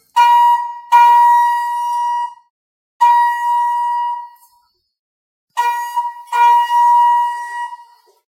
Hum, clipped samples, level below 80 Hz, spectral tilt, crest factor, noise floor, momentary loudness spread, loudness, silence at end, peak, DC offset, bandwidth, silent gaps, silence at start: none; under 0.1%; under -90 dBFS; 4.5 dB/octave; 14 dB; -59 dBFS; 14 LU; -13 LUFS; 0.55 s; 0 dBFS; under 0.1%; 16.5 kHz; 2.50-3.00 s, 4.99-5.48 s; 0.15 s